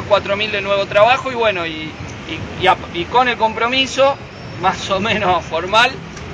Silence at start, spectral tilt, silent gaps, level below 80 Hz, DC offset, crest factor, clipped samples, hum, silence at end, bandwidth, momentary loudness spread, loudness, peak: 0 s; -4 dB/octave; none; -42 dBFS; under 0.1%; 16 dB; under 0.1%; none; 0 s; 9.8 kHz; 13 LU; -16 LUFS; 0 dBFS